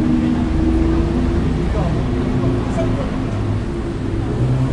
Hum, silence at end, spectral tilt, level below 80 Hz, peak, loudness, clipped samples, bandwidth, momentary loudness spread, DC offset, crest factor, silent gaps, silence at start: none; 0 s; -8.5 dB/octave; -24 dBFS; -6 dBFS; -19 LUFS; under 0.1%; 10.5 kHz; 5 LU; under 0.1%; 12 dB; none; 0 s